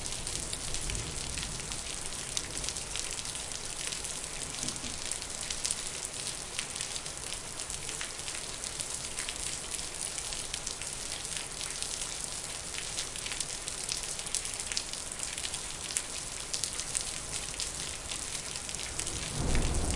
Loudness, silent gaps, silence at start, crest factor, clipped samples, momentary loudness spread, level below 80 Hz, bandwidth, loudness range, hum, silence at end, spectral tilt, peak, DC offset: -34 LUFS; none; 0 s; 32 dB; under 0.1%; 3 LU; -44 dBFS; 11.5 kHz; 1 LU; none; 0 s; -1.5 dB/octave; -6 dBFS; under 0.1%